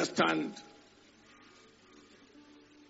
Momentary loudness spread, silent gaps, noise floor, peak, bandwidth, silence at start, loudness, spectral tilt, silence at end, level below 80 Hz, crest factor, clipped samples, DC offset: 28 LU; none; -61 dBFS; -14 dBFS; 8 kHz; 0 s; -32 LUFS; -2.5 dB/octave; 2.25 s; -78 dBFS; 24 dB; under 0.1%; under 0.1%